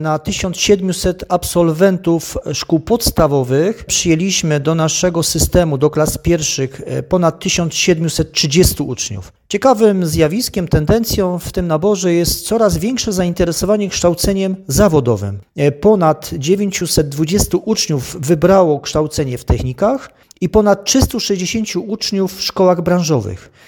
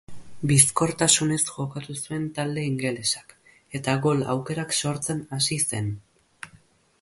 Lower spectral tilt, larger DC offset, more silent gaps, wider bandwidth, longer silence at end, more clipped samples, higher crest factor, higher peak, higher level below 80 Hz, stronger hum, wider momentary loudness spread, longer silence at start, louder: about the same, -4.5 dB/octave vs -3.5 dB/octave; neither; neither; first, 17.5 kHz vs 12 kHz; second, 0.25 s vs 0.45 s; neither; second, 14 dB vs 24 dB; about the same, 0 dBFS vs -2 dBFS; first, -30 dBFS vs -58 dBFS; neither; second, 7 LU vs 15 LU; about the same, 0 s vs 0.1 s; first, -15 LUFS vs -24 LUFS